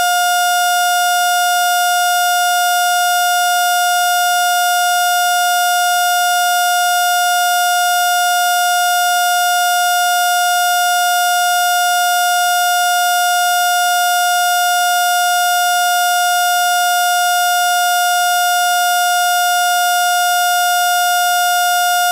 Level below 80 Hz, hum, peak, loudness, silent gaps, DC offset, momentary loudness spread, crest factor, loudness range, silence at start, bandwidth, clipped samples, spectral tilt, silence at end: under -90 dBFS; none; -2 dBFS; -13 LUFS; none; under 0.1%; 0 LU; 10 dB; 0 LU; 0 s; 16 kHz; under 0.1%; 6 dB/octave; 0 s